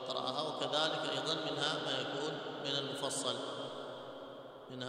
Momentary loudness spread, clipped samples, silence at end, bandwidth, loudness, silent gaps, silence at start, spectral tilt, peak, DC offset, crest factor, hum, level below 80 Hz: 14 LU; under 0.1%; 0 s; 16 kHz; -37 LUFS; none; 0 s; -3 dB/octave; -20 dBFS; under 0.1%; 20 dB; none; -80 dBFS